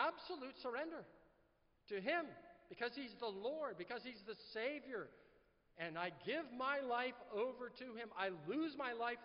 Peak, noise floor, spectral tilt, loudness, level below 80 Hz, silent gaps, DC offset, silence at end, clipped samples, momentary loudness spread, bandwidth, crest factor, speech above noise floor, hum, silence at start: -26 dBFS; -77 dBFS; -2 dB/octave; -45 LUFS; -82 dBFS; none; under 0.1%; 0 s; under 0.1%; 10 LU; 5.6 kHz; 20 dB; 31 dB; none; 0 s